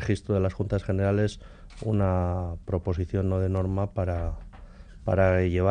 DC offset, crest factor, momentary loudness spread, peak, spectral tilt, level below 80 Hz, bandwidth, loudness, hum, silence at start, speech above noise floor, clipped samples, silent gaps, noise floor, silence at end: under 0.1%; 16 dB; 10 LU; -10 dBFS; -8.5 dB/octave; -42 dBFS; 9.4 kHz; -27 LUFS; none; 0 s; 20 dB; under 0.1%; none; -45 dBFS; 0 s